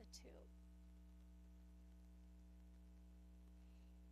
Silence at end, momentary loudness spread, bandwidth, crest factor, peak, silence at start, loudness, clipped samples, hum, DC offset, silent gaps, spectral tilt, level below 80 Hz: 0 s; 3 LU; 14 kHz; 18 dB; -46 dBFS; 0 s; -65 LUFS; under 0.1%; 60 Hz at -65 dBFS; under 0.1%; none; -5 dB/octave; -64 dBFS